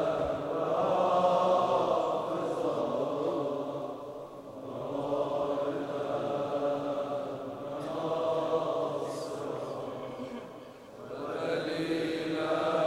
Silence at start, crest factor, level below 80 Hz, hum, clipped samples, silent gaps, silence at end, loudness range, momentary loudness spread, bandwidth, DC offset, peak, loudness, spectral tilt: 0 s; 18 dB; -64 dBFS; none; under 0.1%; none; 0 s; 7 LU; 14 LU; 15 kHz; under 0.1%; -14 dBFS; -32 LUFS; -6 dB/octave